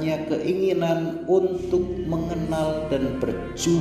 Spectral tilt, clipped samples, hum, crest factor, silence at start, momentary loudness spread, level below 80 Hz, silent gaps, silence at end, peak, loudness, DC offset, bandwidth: -6 dB/octave; under 0.1%; none; 14 dB; 0 s; 5 LU; -42 dBFS; none; 0 s; -8 dBFS; -24 LUFS; under 0.1%; 15 kHz